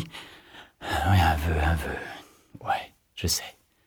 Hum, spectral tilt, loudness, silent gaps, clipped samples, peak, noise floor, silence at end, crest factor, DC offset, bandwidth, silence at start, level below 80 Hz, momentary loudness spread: none; -4.5 dB/octave; -27 LUFS; none; under 0.1%; -10 dBFS; -50 dBFS; 0.35 s; 18 dB; under 0.1%; 18.5 kHz; 0 s; -36 dBFS; 21 LU